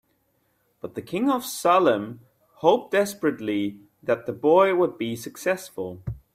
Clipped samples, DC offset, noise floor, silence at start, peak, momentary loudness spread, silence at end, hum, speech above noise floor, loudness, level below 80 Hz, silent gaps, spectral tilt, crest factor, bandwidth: under 0.1%; under 0.1%; -69 dBFS; 0.85 s; -4 dBFS; 16 LU; 0.2 s; none; 46 dB; -24 LUFS; -56 dBFS; none; -5 dB/octave; 20 dB; 16 kHz